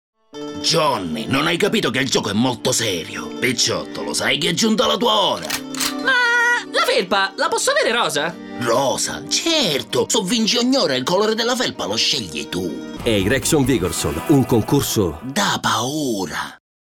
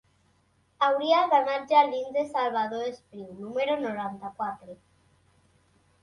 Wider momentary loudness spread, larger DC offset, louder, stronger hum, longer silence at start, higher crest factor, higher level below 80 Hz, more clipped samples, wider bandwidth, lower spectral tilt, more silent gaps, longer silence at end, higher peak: second, 8 LU vs 14 LU; neither; first, -18 LUFS vs -26 LUFS; neither; second, 0.35 s vs 0.8 s; second, 14 dB vs 20 dB; first, -46 dBFS vs -72 dBFS; neither; first, 17.5 kHz vs 11 kHz; second, -3 dB/octave vs -5 dB/octave; neither; second, 0.25 s vs 1.3 s; about the same, -6 dBFS vs -8 dBFS